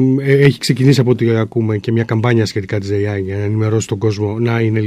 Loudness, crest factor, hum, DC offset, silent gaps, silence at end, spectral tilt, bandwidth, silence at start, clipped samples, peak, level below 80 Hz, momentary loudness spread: -15 LUFS; 14 dB; none; under 0.1%; none; 0 s; -7 dB/octave; 14 kHz; 0 s; under 0.1%; 0 dBFS; -52 dBFS; 7 LU